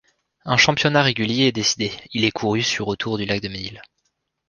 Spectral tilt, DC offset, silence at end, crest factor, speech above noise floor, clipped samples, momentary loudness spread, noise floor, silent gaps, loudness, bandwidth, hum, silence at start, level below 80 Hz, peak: -3.5 dB/octave; under 0.1%; 0.65 s; 20 dB; 52 dB; under 0.1%; 11 LU; -73 dBFS; none; -20 LUFS; 10.5 kHz; none; 0.45 s; -52 dBFS; -2 dBFS